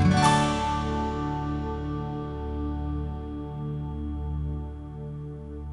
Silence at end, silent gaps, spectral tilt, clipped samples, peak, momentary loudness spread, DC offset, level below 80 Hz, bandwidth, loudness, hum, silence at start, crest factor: 0 s; none; -6 dB/octave; under 0.1%; -8 dBFS; 15 LU; under 0.1%; -36 dBFS; 11.5 kHz; -29 LUFS; none; 0 s; 20 dB